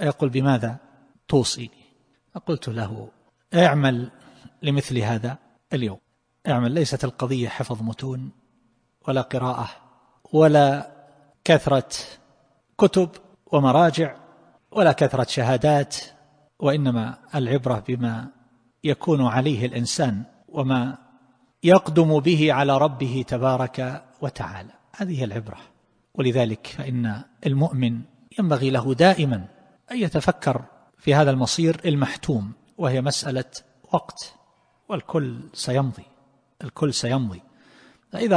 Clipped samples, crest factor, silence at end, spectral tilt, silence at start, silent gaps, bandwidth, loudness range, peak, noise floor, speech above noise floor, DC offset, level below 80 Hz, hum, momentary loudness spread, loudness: under 0.1%; 20 dB; 0 s; -6 dB/octave; 0 s; none; 10.5 kHz; 7 LU; -2 dBFS; -65 dBFS; 44 dB; under 0.1%; -56 dBFS; none; 16 LU; -22 LUFS